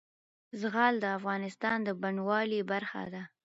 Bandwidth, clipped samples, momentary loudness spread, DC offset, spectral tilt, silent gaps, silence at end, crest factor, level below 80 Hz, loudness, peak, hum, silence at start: 7.6 kHz; under 0.1%; 11 LU; under 0.1%; -3.5 dB/octave; none; 0.15 s; 20 dB; -78 dBFS; -32 LUFS; -12 dBFS; none; 0.55 s